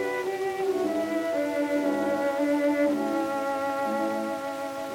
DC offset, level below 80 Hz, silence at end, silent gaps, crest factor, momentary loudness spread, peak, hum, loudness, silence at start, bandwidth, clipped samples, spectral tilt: under 0.1%; -68 dBFS; 0 s; none; 12 dB; 5 LU; -14 dBFS; none; -27 LUFS; 0 s; 17 kHz; under 0.1%; -5 dB/octave